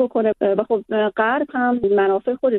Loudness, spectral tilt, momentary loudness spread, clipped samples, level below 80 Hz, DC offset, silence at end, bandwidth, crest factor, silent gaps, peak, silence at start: -19 LUFS; -9 dB/octave; 3 LU; under 0.1%; -58 dBFS; under 0.1%; 0 s; 4.1 kHz; 14 dB; none; -4 dBFS; 0 s